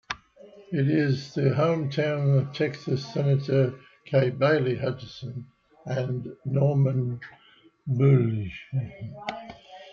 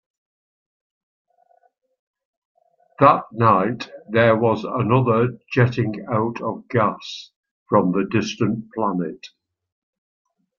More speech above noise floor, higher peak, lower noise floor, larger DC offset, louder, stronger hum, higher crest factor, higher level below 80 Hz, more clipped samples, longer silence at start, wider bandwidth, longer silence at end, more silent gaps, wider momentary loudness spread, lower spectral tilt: second, 26 dB vs 41 dB; second, -8 dBFS vs -2 dBFS; second, -51 dBFS vs -60 dBFS; neither; second, -26 LUFS vs -20 LUFS; neither; about the same, 18 dB vs 20 dB; about the same, -62 dBFS vs -60 dBFS; neither; second, 0.1 s vs 3 s; about the same, 6.8 kHz vs 7 kHz; second, 0 s vs 1.3 s; second, none vs 7.36-7.43 s, 7.51-7.66 s; first, 16 LU vs 12 LU; about the same, -8.5 dB/octave vs -7.5 dB/octave